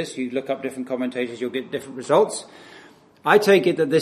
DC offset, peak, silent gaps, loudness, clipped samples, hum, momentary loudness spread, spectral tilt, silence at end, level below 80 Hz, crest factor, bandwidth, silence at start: under 0.1%; 0 dBFS; none; -22 LUFS; under 0.1%; none; 14 LU; -5 dB/octave; 0 s; -70 dBFS; 22 dB; 14 kHz; 0 s